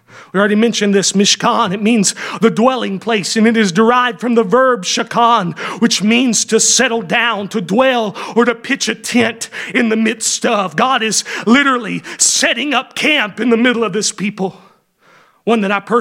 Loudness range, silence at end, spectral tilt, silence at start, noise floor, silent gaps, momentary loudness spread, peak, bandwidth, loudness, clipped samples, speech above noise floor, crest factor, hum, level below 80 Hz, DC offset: 3 LU; 0 s; -3 dB/octave; 0.15 s; -50 dBFS; none; 6 LU; 0 dBFS; 16.5 kHz; -13 LUFS; under 0.1%; 36 dB; 14 dB; none; -64 dBFS; under 0.1%